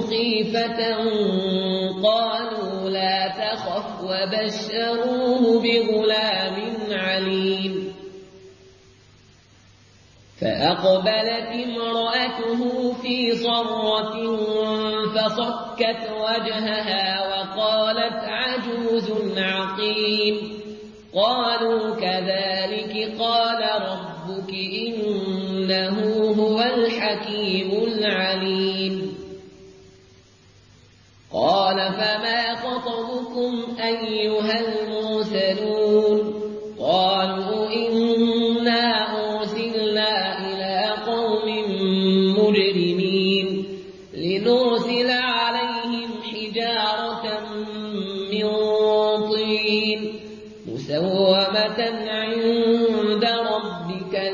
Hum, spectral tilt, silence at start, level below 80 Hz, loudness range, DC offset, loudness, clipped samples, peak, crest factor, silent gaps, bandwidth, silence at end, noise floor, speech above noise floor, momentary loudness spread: none; -6 dB/octave; 0 s; -60 dBFS; 4 LU; under 0.1%; -22 LUFS; under 0.1%; -6 dBFS; 16 dB; none; 7.4 kHz; 0 s; -52 dBFS; 30 dB; 9 LU